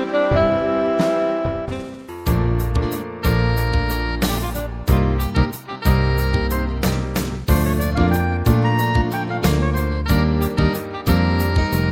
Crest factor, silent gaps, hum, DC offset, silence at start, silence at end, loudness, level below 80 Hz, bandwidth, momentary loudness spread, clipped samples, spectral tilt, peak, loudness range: 16 dB; none; none; under 0.1%; 0 s; 0 s; -20 LUFS; -24 dBFS; 17.5 kHz; 6 LU; under 0.1%; -6.5 dB/octave; -2 dBFS; 2 LU